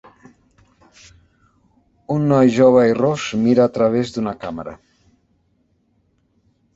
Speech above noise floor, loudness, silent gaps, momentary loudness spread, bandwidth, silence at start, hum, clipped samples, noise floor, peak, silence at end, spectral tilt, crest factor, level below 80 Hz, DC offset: 47 dB; -16 LUFS; none; 16 LU; 8 kHz; 2.1 s; none; under 0.1%; -63 dBFS; 0 dBFS; 2 s; -7 dB/octave; 18 dB; -54 dBFS; under 0.1%